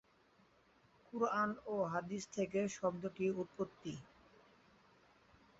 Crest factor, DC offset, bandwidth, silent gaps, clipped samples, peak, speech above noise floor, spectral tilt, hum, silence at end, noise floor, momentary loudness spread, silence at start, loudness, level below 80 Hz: 20 dB; under 0.1%; 7.6 kHz; none; under 0.1%; -24 dBFS; 31 dB; -5.5 dB/octave; none; 1.55 s; -71 dBFS; 12 LU; 1.15 s; -40 LUFS; -76 dBFS